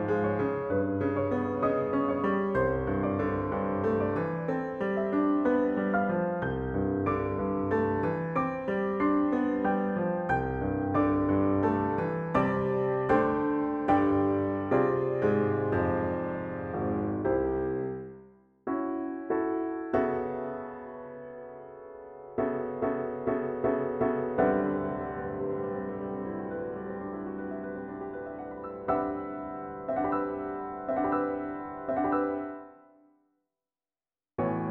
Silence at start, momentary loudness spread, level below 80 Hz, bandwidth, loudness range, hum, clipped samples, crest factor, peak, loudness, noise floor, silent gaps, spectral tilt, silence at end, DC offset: 0 s; 11 LU; -52 dBFS; 4.8 kHz; 8 LU; none; under 0.1%; 18 dB; -10 dBFS; -30 LUFS; under -90 dBFS; none; -10 dB/octave; 0 s; under 0.1%